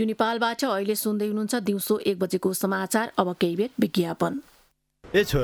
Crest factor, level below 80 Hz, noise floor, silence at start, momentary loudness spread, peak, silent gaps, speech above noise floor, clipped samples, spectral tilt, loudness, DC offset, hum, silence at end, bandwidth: 20 dB; -48 dBFS; -63 dBFS; 0 s; 2 LU; -6 dBFS; none; 38 dB; under 0.1%; -5 dB/octave; -25 LUFS; under 0.1%; none; 0 s; 19.5 kHz